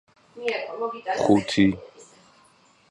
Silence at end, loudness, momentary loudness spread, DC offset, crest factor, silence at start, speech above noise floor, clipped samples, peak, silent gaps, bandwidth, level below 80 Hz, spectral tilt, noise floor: 0.85 s; -24 LUFS; 11 LU; under 0.1%; 22 dB; 0.35 s; 35 dB; under 0.1%; -4 dBFS; none; 11 kHz; -56 dBFS; -5.5 dB/octave; -58 dBFS